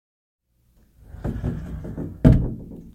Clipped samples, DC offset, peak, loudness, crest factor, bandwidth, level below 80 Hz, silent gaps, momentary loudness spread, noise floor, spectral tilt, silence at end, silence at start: under 0.1%; under 0.1%; 0 dBFS; -23 LUFS; 24 dB; 8.6 kHz; -30 dBFS; none; 16 LU; -60 dBFS; -10 dB/octave; 0.05 s; 1.15 s